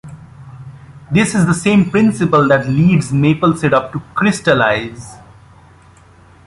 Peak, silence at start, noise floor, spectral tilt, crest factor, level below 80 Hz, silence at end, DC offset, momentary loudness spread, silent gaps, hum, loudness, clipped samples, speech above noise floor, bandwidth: -2 dBFS; 0.05 s; -44 dBFS; -6 dB/octave; 14 dB; -44 dBFS; 1.3 s; under 0.1%; 19 LU; none; none; -14 LUFS; under 0.1%; 31 dB; 11.5 kHz